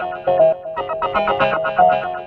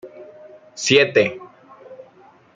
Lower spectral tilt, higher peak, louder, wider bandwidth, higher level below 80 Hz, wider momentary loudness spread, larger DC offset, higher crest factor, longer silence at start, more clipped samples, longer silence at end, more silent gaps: first, -7 dB/octave vs -3 dB/octave; about the same, -2 dBFS vs -2 dBFS; about the same, -17 LUFS vs -17 LUFS; second, 5.2 kHz vs 9.4 kHz; first, -50 dBFS vs -68 dBFS; second, 8 LU vs 25 LU; neither; about the same, 16 dB vs 20 dB; about the same, 0 s vs 0.05 s; neither; second, 0 s vs 0.6 s; neither